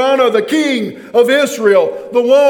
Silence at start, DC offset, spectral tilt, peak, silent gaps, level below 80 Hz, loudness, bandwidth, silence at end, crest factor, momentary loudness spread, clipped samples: 0 s; under 0.1%; -4 dB/octave; 0 dBFS; none; -64 dBFS; -13 LUFS; 18 kHz; 0 s; 12 dB; 5 LU; under 0.1%